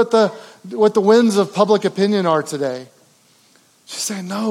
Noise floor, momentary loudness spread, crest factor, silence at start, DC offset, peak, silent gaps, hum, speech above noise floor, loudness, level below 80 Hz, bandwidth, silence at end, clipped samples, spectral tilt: -54 dBFS; 16 LU; 18 dB; 0 s; under 0.1%; 0 dBFS; none; none; 38 dB; -17 LUFS; -80 dBFS; 15.5 kHz; 0 s; under 0.1%; -5 dB/octave